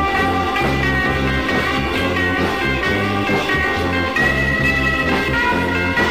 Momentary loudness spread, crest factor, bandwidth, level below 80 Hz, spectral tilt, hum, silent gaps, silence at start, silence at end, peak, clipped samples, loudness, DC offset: 3 LU; 12 dB; 15.5 kHz; -30 dBFS; -5.5 dB/octave; none; none; 0 s; 0 s; -6 dBFS; under 0.1%; -17 LUFS; 0.6%